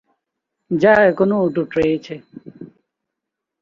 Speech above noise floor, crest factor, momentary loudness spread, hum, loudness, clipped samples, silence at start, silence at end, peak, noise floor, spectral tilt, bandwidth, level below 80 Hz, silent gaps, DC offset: 65 dB; 18 dB; 22 LU; none; -16 LUFS; under 0.1%; 0.7 s; 0.95 s; -2 dBFS; -82 dBFS; -8 dB/octave; 7.4 kHz; -52 dBFS; none; under 0.1%